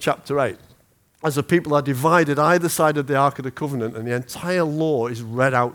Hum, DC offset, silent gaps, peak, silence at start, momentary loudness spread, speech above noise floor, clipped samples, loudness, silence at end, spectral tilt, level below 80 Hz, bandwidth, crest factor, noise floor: none; under 0.1%; none; -2 dBFS; 0 s; 9 LU; 37 dB; under 0.1%; -21 LUFS; 0 s; -5.5 dB/octave; -60 dBFS; over 20 kHz; 18 dB; -58 dBFS